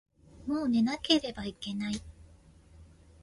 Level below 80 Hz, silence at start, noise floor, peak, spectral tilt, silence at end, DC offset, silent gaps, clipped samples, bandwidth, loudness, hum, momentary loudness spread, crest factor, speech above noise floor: -56 dBFS; 0.35 s; -57 dBFS; -10 dBFS; -4.5 dB/octave; 0.35 s; under 0.1%; none; under 0.1%; 11.5 kHz; -31 LUFS; none; 12 LU; 22 dB; 27 dB